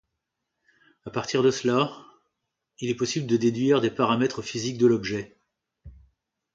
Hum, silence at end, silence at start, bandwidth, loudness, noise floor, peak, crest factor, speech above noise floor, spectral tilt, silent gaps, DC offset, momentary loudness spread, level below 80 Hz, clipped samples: none; 0.65 s; 1.05 s; 7.8 kHz; -25 LUFS; -82 dBFS; -8 dBFS; 20 dB; 58 dB; -5.5 dB/octave; none; under 0.1%; 12 LU; -60 dBFS; under 0.1%